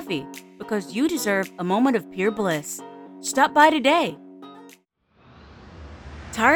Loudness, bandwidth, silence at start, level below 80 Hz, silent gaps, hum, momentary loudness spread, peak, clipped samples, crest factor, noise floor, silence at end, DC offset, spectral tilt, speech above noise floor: -22 LUFS; over 20 kHz; 0 s; -54 dBFS; none; none; 26 LU; -4 dBFS; under 0.1%; 20 dB; -61 dBFS; 0 s; under 0.1%; -4 dB/octave; 39 dB